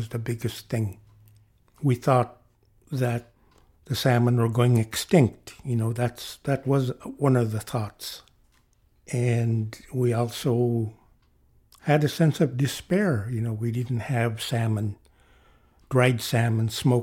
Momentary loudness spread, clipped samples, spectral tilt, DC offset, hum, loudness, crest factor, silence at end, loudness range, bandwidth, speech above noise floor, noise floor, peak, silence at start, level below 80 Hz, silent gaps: 11 LU; under 0.1%; -6.5 dB/octave; under 0.1%; none; -25 LUFS; 18 dB; 0 s; 4 LU; 16.5 kHz; 39 dB; -63 dBFS; -6 dBFS; 0 s; -58 dBFS; none